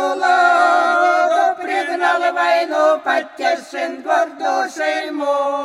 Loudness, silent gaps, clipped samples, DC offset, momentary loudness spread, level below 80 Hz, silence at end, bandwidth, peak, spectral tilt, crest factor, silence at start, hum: -16 LUFS; none; under 0.1%; under 0.1%; 7 LU; -76 dBFS; 0 s; 12.5 kHz; -2 dBFS; -1 dB/octave; 14 dB; 0 s; none